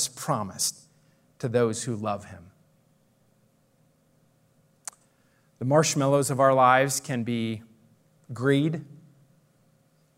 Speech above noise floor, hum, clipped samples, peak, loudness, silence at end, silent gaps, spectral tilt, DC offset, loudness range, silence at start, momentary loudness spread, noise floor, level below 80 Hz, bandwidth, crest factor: 41 dB; none; under 0.1%; -6 dBFS; -25 LUFS; 1.25 s; none; -4.5 dB/octave; under 0.1%; 10 LU; 0 s; 22 LU; -65 dBFS; -74 dBFS; 16 kHz; 22 dB